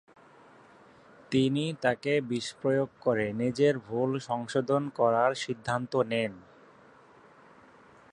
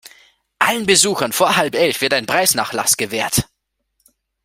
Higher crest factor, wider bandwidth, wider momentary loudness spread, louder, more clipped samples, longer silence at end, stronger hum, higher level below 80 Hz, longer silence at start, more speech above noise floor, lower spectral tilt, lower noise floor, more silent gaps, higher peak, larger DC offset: about the same, 20 dB vs 18 dB; second, 11 kHz vs 16.5 kHz; about the same, 5 LU vs 6 LU; second, -29 LUFS vs -16 LUFS; neither; first, 1.7 s vs 1 s; neither; second, -68 dBFS vs -48 dBFS; first, 1.3 s vs 0.6 s; second, 28 dB vs 53 dB; first, -6 dB/octave vs -2 dB/octave; second, -56 dBFS vs -69 dBFS; neither; second, -10 dBFS vs 0 dBFS; neither